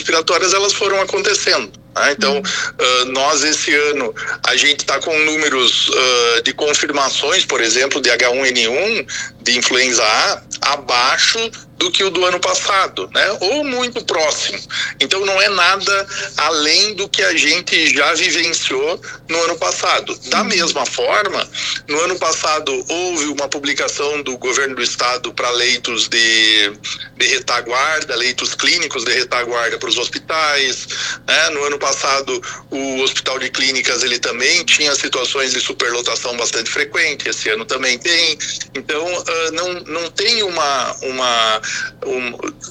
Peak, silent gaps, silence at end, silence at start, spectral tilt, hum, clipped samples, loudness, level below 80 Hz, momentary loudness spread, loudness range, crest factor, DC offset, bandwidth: 0 dBFS; none; 0 s; 0 s; -0.5 dB/octave; none; under 0.1%; -15 LUFS; -56 dBFS; 8 LU; 4 LU; 16 dB; under 0.1%; 14.5 kHz